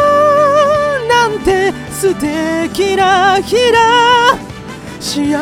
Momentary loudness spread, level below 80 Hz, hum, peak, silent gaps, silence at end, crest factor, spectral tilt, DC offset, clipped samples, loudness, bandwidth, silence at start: 11 LU; -38 dBFS; none; 0 dBFS; none; 0 s; 12 dB; -3.5 dB/octave; under 0.1%; under 0.1%; -11 LUFS; 16.5 kHz; 0 s